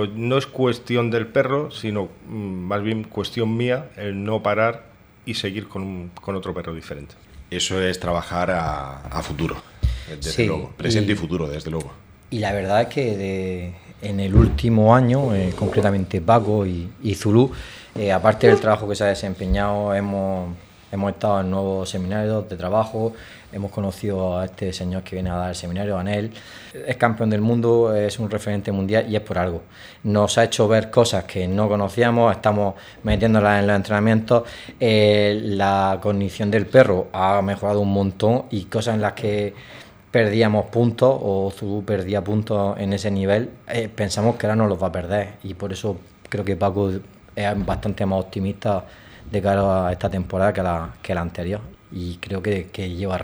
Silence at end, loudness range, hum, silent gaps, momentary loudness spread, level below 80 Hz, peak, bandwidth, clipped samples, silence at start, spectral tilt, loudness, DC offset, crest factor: 0 s; 7 LU; none; none; 13 LU; -38 dBFS; 0 dBFS; over 20 kHz; under 0.1%; 0 s; -6.5 dB/octave; -21 LUFS; under 0.1%; 20 dB